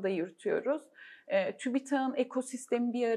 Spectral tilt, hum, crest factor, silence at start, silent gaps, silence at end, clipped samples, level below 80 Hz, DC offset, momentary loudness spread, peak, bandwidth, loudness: -5 dB/octave; none; 16 dB; 0 s; none; 0 s; under 0.1%; under -90 dBFS; under 0.1%; 6 LU; -16 dBFS; 12.5 kHz; -33 LUFS